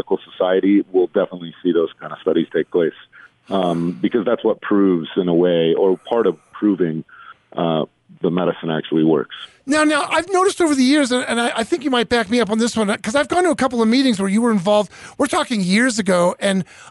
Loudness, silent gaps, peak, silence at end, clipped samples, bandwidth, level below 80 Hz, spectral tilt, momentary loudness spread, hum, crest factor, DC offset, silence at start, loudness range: -18 LUFS; none; -6 dBFS; 0 s; under 0.1%; 11.5 kHz; -56 dBFS; -5 dB/octave; 7 LU; none; 12 dB; under 0.1%; 0.1 s; 3 LU